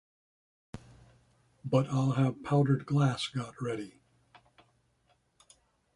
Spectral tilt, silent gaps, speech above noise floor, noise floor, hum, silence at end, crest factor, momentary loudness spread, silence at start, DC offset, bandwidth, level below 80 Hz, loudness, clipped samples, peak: -7 dB/octave; none; 43 dB; -72 dBFS; none; 2.05 s; 18 dB; 23 LU; 0.75 s; under 0.1%; 11 kHz; -66 dBFS; -30 LUFS; under 0.1%; -14 dBFS